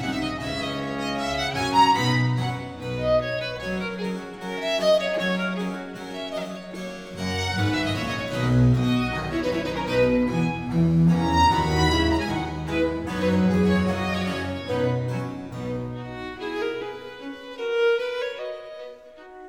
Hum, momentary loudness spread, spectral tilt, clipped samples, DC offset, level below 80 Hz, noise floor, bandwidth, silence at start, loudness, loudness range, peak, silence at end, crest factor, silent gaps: none; 14 LU; -6 dB/octave; under 0.1%; 0.1%; -42 dBFS; -44 dBFS; 17 kHz; 0 s; -24 LUFS; 7 LU; -8 dBFS; 0 s; 16 dB; none